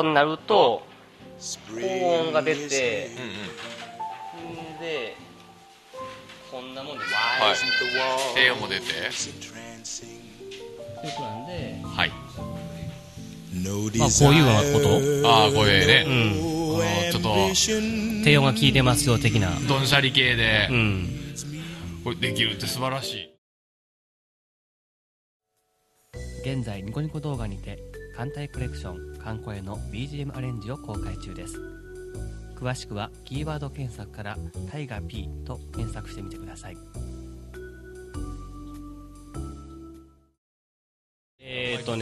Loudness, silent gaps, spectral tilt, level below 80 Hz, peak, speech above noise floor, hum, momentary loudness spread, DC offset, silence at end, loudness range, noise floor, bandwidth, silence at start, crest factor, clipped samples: -23 LUFS; 23.38-25.40 s, 40.38-41.38 s; -4 dB/octave; -44 dBFS; -2 dBFS; 48 dB; none; 22 LU; under 0.1%; 0 s; 19 LU; -72 dBFS; 13.5 kHz; 0 s; 24 dB; under 0.1%